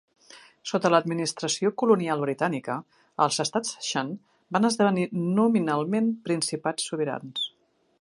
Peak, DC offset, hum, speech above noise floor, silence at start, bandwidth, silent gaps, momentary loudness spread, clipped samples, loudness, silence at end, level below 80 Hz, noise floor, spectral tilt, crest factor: -6 dBFS; under 0.1%; none; 41 dB; 0.3 s; 11.5 kHz; none; 9 LU; under 0.1%; -26 LUFS; 0.55 s; -76 dBFS; -66 dBFS; -4.5 dB/octave; 20 dB